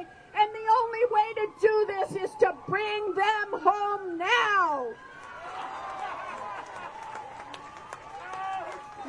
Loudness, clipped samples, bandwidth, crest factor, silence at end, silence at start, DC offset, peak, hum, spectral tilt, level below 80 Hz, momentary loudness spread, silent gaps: -27 LUFS; under 0.1%; 11 kHz; 20 dB; 0 s; 0 s; under 0.1%; -10 dBFS; none; -3.5 dB/octave; -66 dBFS; 18 LU; none